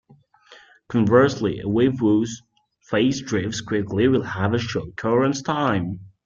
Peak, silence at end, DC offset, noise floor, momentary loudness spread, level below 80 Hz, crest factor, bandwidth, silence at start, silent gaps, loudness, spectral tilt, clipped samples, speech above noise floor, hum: -2 dBFS; 0.2 s; under 0.1%; -53 dBFS; 9 LU; -54 dBFS; 20 dB; 7.6 kHz; 0.5 s; none; -22 LUFS; -6 dB/octave; under 0.1%; 32 dB; none